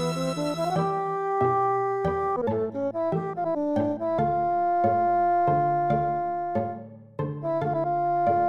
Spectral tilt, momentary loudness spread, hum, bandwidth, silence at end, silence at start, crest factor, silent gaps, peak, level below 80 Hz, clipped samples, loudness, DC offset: -7.5 dB/octave; 6 LU; none; 12.5 kHz; 0 s; 0 s; 14 dB; none; -10 dBFS; -54 dBFS; under 0.1%; -26 LUFS; 0.1%